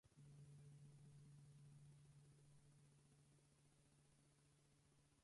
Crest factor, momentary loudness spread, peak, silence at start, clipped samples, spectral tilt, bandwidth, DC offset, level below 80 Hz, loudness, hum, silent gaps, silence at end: 14 dB; 3 LU; -56 dBFS; 0.05 s; under 0.1%; -6 dB/octave; 11 kHz; under 0.1%; -86 dBFS; -67 LUFS; none; none; 0 s